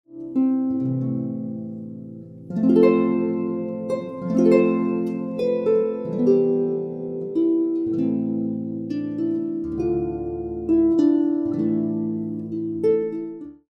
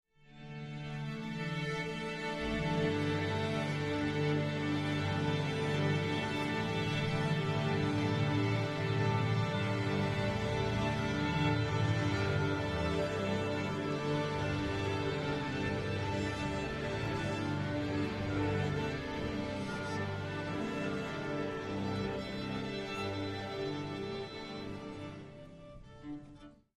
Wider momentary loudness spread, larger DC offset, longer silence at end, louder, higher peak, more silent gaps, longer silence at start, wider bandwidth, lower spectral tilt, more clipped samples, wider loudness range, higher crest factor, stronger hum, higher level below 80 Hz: about the same, 12 LU vs 10 LU; neither; about the same, 0.2 s vs 0.25 s; first, -22 LUFS vs -35 LUFS; first, -4 dBFS vs -20 dBFS; neither; second, 0.1 s vs 0.3 s; second, 6 kHz vs 12.5 kHz; first, -9.5 dB/octave vs -6.5 dB/octave; neither; about the same, 3 LU vs 5 LU; about the same, 18 dB vs 14 dB; neither; about the same, -52 dBFS vs -54 dBFS